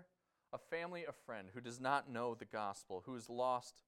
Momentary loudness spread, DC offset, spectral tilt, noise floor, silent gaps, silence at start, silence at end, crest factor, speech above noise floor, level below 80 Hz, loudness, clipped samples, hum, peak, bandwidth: 12 LU; under 0.1%; -4.5 dB/octave; -78 dBFS; none; 0 s; 0.1 s; 24 dB; 34 dB; -84 dBFS; -44 LUFS; under 0.1%; none; -22 dBFS; 16 kHz